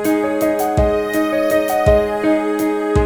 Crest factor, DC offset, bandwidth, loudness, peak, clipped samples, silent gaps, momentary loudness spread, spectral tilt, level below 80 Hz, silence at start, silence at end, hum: 14 dB; under 0.1%; over 20 kHz; -16 LUFS; -2 dBFS; under 0.1%; none; 3 LU; -6.5 dB/octave; -28 dBFS; 0 s; 0 s; none